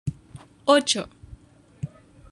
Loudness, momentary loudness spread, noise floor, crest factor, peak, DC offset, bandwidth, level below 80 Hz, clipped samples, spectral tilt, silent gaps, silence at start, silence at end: -22 LUFS; 19 LU; -49 dBFS; 24 dB; -4 dBFS; under 0.1%; 12.5 kHz; -52 dBFS; under 0.1%; -3.5 dB/octave; none; 0.05 s; 0.45 s